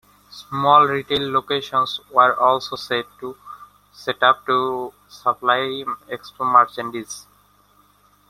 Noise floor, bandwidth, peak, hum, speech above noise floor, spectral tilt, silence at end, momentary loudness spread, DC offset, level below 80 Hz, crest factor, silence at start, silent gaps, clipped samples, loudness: -57 dBFS; 15 kHz; -2 dBFS; 50 Hz at -55 dBFS; 37 dB; -4 dB/octave; 1.1 s; 19 LU; under 0.1%; -62 dBFS; 20 dB; 0.3 s; none; under 0.1%; -19 LUFS